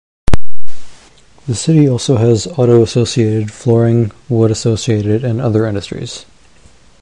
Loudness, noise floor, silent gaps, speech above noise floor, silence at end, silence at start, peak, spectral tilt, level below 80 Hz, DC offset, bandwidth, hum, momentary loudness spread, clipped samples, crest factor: -14 LUFS; -46 dBFS; none; 34 dB; 0 s; 0.25 s; 0 dBFS; -6.5 dB/octave; -32 dBFS; under 0.1%; 11 kHz; none; 11 LU; under 0.1%; 10 dB